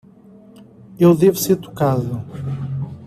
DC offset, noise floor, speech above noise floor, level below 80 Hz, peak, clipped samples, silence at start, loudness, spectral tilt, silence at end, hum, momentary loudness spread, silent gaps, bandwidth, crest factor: under 0.1%; -45 dBFS; 29 dB; -52 dBFS; -2 dBFS; under 0.1%; 0.9 s; -18 LUFS; -7 dB/octave; 0 s; none; 14 LU; none; 15 kHz; 16 dB